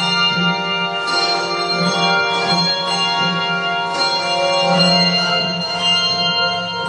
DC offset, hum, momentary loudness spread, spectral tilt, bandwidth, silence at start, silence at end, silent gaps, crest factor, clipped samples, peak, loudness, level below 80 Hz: under 0.1%; none; 5 LU; -3.5 dB/octave; 10.5 kHz; 0 s; 0 s; none; 16 dB; under 0.1%; -2 dBFS; -15 LUFS; -56 dBFS